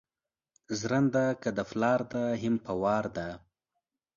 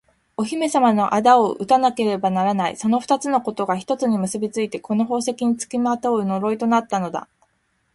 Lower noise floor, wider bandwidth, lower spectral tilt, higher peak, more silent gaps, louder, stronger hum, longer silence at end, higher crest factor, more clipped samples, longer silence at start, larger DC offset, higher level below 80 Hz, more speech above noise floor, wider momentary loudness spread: first, under -90 dBFS vs -67 dBFS; second, 7.4 kHz vs 11.5 kHz; about the same, -6 dB/octave vs -5.5 dB/octave; second, -14 dBFS vs -2 dBFS; neither; second, -30 LUFS vs -20 LUFS; neither; about the same, 0.8 s vs 0.75 s; about the same, 18 dB vs 18 dB; neither; first, 0.7 s vs 0.4 s; neither; about the same, -62 dBFS vs -62 dBFS; first, over 61 dB vs 47 dB; first, 11 LU vs 8 LU